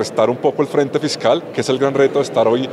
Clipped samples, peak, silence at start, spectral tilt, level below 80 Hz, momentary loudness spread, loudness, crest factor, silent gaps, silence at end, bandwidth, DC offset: under 0.1%; -2 dBFS; 0 s; -5 dB/octave; -66 dBFS; 3 LU; -17 LUFS; 14 dB; none; 0 s; 12.5 kHz; under 0.1%